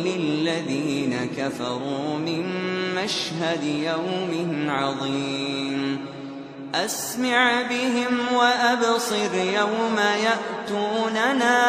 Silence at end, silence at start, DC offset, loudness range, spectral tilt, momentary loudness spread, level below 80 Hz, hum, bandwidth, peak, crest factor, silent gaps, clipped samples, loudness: 0 s; 0 s; under 0.1%; 5 LU; -4 dB/octave; 8 LU; -66 dBFS; none; 15 kHz; -6 dBFS; 18 dB; none; under 0.1%; -23 LUFS